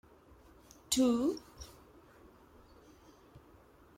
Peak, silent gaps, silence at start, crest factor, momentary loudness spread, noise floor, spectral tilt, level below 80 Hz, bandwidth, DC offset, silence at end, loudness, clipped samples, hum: -16 dBFS; none; 0.9 s; 22 dB; 24 LU; -61 dBFS; -3.5 dB/octave; -64 dBFS; 16.5 kHz; under 0.1%; 0.6 s; -32 LUFS; under 0.1%; none